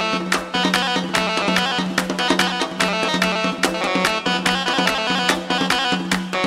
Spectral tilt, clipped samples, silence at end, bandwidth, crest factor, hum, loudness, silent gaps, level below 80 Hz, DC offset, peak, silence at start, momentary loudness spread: -3.5 dB/octave; under 0.1%; 0 s; 16 kHz; 20 dB; none; -19 LUFS; none; -50 dBFS; under 0.1%; 0 dBFS; 0 s; 3 LU